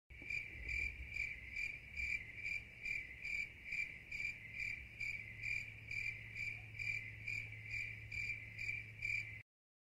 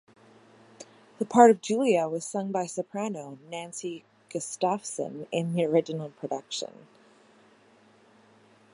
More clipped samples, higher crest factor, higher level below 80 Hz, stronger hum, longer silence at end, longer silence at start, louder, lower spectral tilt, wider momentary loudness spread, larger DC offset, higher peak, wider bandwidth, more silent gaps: neither; second, 16 dB vs 26 dB; first, -60 dBFS vs -82 dBFS; neither; second, 0.55 s vs 2.05 s; second, 0.1 s vs 0.8 s; second, -43 LUFS vs -27 LUFS; second, -3 dB/octave vs -5 dB/octave; second, 3 LU vs 19 LU; neither; second, -30 dBFS vs -2 dBFS; first, 16 kHz vs 11.5 kHz; neither